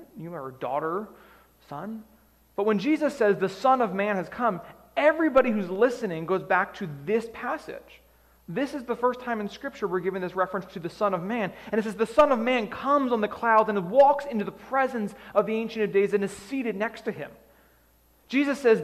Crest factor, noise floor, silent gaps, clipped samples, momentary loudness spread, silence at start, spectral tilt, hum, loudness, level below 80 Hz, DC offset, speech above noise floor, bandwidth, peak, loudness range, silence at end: 18 dB; -61 dBFS; none; under 0.1%; 14 LU; 0 s; -6 dB/octave; none; -26 LUFS; -62 dBFS; under 0.1%; 36 dB; 14.5 kHz; -8 dBFS; 7 LU; 0 s